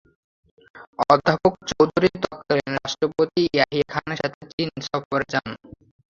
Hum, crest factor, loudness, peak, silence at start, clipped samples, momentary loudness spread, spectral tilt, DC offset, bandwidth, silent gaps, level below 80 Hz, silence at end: none; 22 dB; -22 LUFS; -2 dBFS; 0.75 s; under 0.1%; 10 LU; -5.5 dB/octave; under 0.1%; 7.6 kHz; 0.87-0.93 s, 4.34-4.41 s, 4.53-4.58 s, 5.05-5.11 s; -54 dBFS; 0.55 s